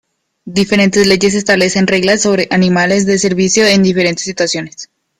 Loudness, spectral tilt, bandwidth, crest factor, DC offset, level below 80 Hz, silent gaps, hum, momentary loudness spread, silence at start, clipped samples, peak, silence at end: -11 LUFS; -4 dB/octave; 13.5 kHz; 12 dB; under 0.1%; -46 dBFS; none; none; 7 LU; 0.45 s; under 0.1%; 0 dBFS; 0.35 s